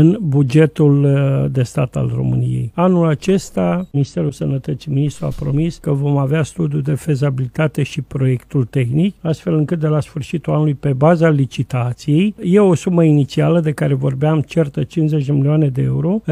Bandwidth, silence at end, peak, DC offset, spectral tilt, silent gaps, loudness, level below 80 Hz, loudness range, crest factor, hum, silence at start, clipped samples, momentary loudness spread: 11.5 kHz; 0 s; 0 dBFS; under 0.1%; -8 dB/octave; none; -16 LUFS; -44 dBFS; 4 LU; 14 dB; none; 0 s; under 0.1%; 7 LU